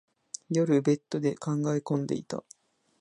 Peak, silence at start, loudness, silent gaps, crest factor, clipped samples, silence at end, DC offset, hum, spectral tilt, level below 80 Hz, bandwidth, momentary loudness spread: -14 dBFS; 0.5 s; -29 LUFS; none; 16 dB; under 0.1%; 0.6 s; under 0.1%; none; -7 dB/octave; -72 dBFS; 11 kHz; 15 LU